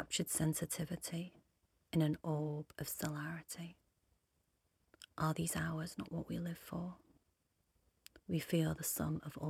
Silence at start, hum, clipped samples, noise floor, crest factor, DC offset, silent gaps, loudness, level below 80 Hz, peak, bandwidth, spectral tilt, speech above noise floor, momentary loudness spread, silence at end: 0 s; none; under 0.1%; -81 dBFS; 18 dB; under 0.1%; none; -40 LUFS; -66 dBFS; -24 dBFS; 16.5 kHz; -5 dB/octave; 41 dB; 13 LU; 0 s